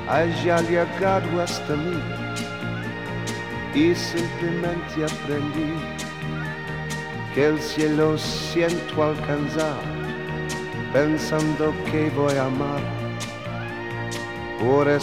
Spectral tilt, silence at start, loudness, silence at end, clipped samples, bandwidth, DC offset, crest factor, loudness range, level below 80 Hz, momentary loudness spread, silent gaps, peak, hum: -5.5 dB/octave; 0 s; -24 LUFS; 0 s; under 0.1%; 16 kHz; 0.3%; 18 dB; 2 LU; -46 dBFS; 9 LU; none; -6 dBFS; none